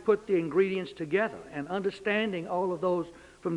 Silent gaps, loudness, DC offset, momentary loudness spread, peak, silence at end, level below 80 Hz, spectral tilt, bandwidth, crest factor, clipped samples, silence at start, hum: none; -30 LUFS; under 0.1%; 8 LU; -12 dBFS; 0 s; -66 dBFS; -7 dB/octave; 10.5 kHz; 18 dB; under 0.1%; 0 s; none